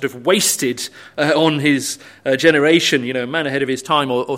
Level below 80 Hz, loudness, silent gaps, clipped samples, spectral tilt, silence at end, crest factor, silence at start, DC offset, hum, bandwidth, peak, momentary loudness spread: -62 dBFS; -16 LUFS; none; under 0.1%; -3.5 dB/octave; 0 s; 16 dB; 0 s; under 0.1%; none; 16 kHz; 0 dBFS; 9 LU